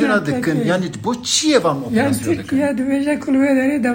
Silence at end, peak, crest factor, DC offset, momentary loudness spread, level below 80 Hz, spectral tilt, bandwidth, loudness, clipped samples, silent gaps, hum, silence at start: 0 s; -2 dBFS; 16 dB; under 0.1%; 5 LU; -52 dBFS; -4.5 dB/octave; 16.5 kHz; -17 LUFS; under 0.1%; none; none; 0 s